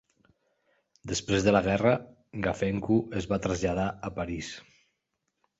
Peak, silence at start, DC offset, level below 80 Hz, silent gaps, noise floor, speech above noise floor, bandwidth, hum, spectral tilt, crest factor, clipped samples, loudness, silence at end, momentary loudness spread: -10 dBFS; 1.05 s; under 0.1%; -50 dBFS; none; -81 dBFS; 53 dB; 8.2 kHz; none; -5.5 dB/octave; 20 dB; under 0.1%; -28 LUFS; 1 s; 14 LU